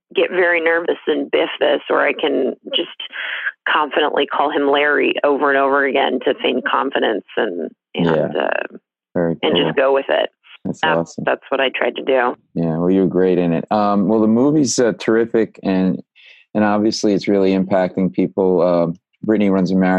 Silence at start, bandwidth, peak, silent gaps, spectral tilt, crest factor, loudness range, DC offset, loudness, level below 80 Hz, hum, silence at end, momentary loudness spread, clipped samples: 0.15 s; 10 kHz; 0 dBFS; none; -5 dB/octave; 16 dB; 3 LU; under 0.1%; -17 LUFS; -64 dBFS; none; 0 s; 7 LU; under 0.1%